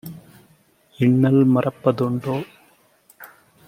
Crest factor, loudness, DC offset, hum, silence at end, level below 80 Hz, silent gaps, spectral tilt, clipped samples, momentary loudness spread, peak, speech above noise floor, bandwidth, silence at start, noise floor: 18 dB; -19 LUFS; under 0.1%; none; 0.4 s; -62 dBFS; none; -9 dB/octave; under 0.1%; 15 LU; -4 dBFS; 39 dB; 15.5 kHz; 0.05 s; -57 dBFS